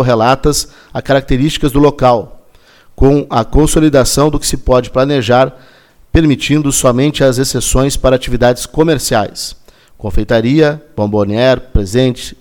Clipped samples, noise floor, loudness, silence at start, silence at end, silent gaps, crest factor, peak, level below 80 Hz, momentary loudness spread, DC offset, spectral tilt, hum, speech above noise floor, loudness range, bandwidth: under 0.1%; -43 dBFS; -12 LUFS; 0 s; 0.05 s; none; 12 dB; 0 dBFS; -24 dBFS; 7 LU; under 0.1%; -5 dB/octave; none; 32 dB; 2 LU; 18.5 kHz